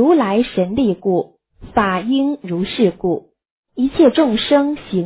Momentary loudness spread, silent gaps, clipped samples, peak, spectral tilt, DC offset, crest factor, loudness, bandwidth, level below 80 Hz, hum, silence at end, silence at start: 9 LU; 3.50-3.63 s; under 0.1%; -2 dBFS; -10.5 dB/octave; under 0.1%; 14 dB; -17 LUFS; 4 kHz; -46 dBFS; none; 0 s; 0 s